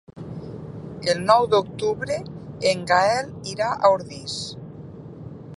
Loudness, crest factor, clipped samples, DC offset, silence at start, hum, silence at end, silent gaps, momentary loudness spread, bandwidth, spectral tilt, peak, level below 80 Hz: -22 LUFS; 22 dB; under 0.1%; under 0.1%; 0.1 s; none; 0 s; none; 21 LU; 11.5 kHz; -4.5 dB/octave; -2 dBFS; -54 dBFS